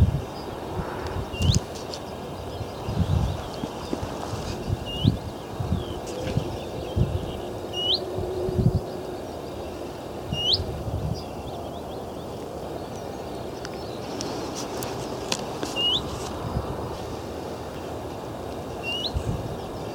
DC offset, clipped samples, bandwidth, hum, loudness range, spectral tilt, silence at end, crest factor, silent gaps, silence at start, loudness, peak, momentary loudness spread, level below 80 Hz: under 0.1%; under 0.1%; 19 kHz; none; 6 LU; -5 dB/octave; 0 s; 26 dB; none; 0 s; -29 LUFS; -2 dBFS; 11 LU; -38 dBFS